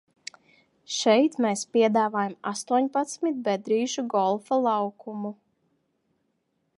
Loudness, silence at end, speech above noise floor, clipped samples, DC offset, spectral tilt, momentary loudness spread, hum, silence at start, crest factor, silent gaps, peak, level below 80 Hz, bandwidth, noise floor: -25 LUFS; 1.45 s; 50 dB; under 0.1%; under 0.1%; -4 dB/octave; 14 LU; none; 0.9 s; 18 dB; none; -8 dBFS; -82 dBFS; 11.5 kHz; -74 dBFS